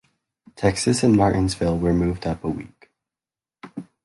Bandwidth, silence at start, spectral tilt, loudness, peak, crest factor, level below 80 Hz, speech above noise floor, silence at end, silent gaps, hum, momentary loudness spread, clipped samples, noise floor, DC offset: 11.5 kHz; 0.6 s; -6 dB/octave; -21 LUFS; -6 dBFS; 18 dB; -40 dBFS; over 70 dB; 0.2 s; none; none; 19 LU; under 0.1%; under -90 dBFS; under 0.1%